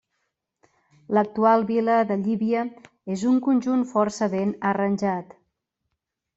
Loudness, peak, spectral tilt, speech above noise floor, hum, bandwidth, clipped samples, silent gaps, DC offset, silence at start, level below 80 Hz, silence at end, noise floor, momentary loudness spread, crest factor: -23 LUFS; -6 dBFS; -7 dB/octave; 59 dB; none; 8 kHz; under 0.1%; none; under 0.1%; 1.1 s; -68 dBFS; 1.15 s; -81 dBFS; 7 LU; 18 dB